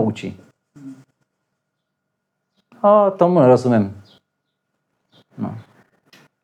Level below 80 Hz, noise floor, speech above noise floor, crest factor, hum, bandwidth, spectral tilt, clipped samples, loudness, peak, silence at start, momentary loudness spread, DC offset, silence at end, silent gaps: -74 dBFS; -77 dBFS; 61 dB; 20 dB; none; 9.6 kHz; -8.5 dB/octave; under 0.1%; -16 LUFS; -2 dBFS; 0 s; 18 LU; under 0.1%; 0.8 s; none